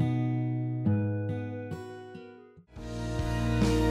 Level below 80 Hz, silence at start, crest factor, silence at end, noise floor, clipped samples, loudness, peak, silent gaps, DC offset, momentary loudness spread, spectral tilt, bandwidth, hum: -40 dBFS; 0 s; 16 dB; 0 s; -52 dBFS; under 0.1%; -31 LUFS; -14 dBFS; none; under 0.1%; 18 LU; -7.5 dB/octave; 13 kHz; none